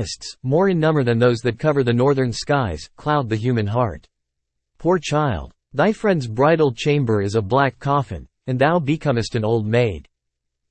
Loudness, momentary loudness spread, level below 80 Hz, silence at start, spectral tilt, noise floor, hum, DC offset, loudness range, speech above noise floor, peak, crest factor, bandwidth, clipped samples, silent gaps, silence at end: -20 LUFS; 10 LU; -46 dBFS; 0 s; -6.5 dB/octave; -78 dBFS; none; under 0.1%; 3 LU; 59 dB; -4 dBFS; 16 dB; 8.8 kHz; under 0.1%; none; 0.7 s